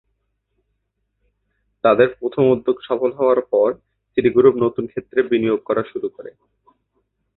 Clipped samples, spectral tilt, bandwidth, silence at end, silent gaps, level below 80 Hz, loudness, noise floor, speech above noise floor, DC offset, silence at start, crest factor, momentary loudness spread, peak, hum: under 0.1%; -11.5 dB/octave; 4.1 kHz; 1.1 s; none; -58 dBFS; -18 LUFS; -73 dBFS; 55 dB; under 0.1%; 1.85 s; 18 dB; 13 LU; -2 dBFS; none